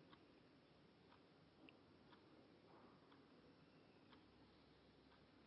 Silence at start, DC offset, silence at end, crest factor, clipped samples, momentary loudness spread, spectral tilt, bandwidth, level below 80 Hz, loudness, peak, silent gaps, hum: 0 s; under 0.1%; 0 s; 20 dB; under 0.1%; 1 LU; -4 dB/octave; 5.6 kHz; -88 dBFS; -69 LUFS; -50 dBFS; none; none